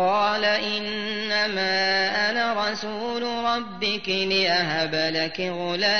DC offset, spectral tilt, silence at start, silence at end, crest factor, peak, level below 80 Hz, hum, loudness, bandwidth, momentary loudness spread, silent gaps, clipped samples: 0.6%; -3.5 dB/octave; 0 s; 0 s; 16 dB; -8 dBFS; -60 dBFS; none; -23 LUFS; 6.6 kHz; 6 LU; none; under 0.1%